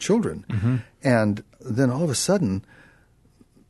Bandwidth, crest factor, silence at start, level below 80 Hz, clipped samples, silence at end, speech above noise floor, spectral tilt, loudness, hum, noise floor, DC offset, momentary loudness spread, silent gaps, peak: 12.5 kHz; 18 dB; 0 s; -54 dBFS; under 0.1%; 1.1 s; 35 dB; -5.5 dB/octave; -24 LUFS; none; -57 dBFS; under 0.1%; 8 LU; none; -6 dBFS